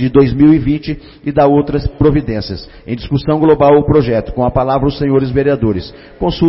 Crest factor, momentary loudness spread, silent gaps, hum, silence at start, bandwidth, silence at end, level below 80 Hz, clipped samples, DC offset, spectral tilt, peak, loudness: 12 dB; 14 LU; none; none; 0 s; 5.8 kHz; 0 s; -28 dBFS; under 0.1%; under 0.1%; -12 dB/octave; 0 dBFS; -13 LUFS